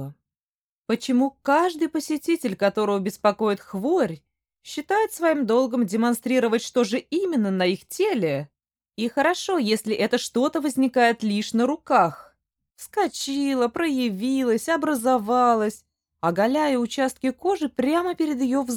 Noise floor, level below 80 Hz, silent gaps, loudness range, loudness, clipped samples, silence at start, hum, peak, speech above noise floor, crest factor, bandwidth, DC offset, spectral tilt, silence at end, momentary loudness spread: under -90 dBFS; -66 dBFS; 0.43-0.84 s; 2 LU; -23 LUFS; under 0.1%; 0 s; none; -6 dBFS; over 68 dB; 18 dB; 18.5 kHz; under 0.1%; -4.5 dB/octave; 0 s; 7 LU